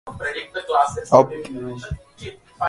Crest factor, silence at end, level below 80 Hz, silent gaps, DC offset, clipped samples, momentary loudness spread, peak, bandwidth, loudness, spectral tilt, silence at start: 22 dB; 0 s; -46 dBFS; none; under 0.1%; under 0.1%; 21 LU; 0 dBFS; 11.5 kHz; -20 LUFS; -5.5 dB/octave; 0.05 s